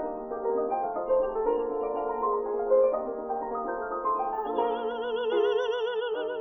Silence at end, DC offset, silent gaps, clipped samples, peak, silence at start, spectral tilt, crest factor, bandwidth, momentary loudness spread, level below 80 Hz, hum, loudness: 0 s; under 0.1%; none; under 0.1%; -14 dBFS; 0 s; -5.5 dB/octave; 14 dB; 6.2 kHz; 7 LU; -58 dBFS; none; -29 LUFS